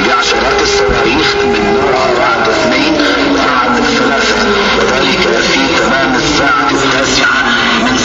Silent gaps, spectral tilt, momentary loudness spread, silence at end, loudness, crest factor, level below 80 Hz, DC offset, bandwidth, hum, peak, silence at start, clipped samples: none; -3 dB/octave; 1 LU; 0 s; -9 LUFS; 10 dB; -32 dBFS; under 0.1%; 8.2 kHz; none; 0 dBFS; 0 s; under 0.1%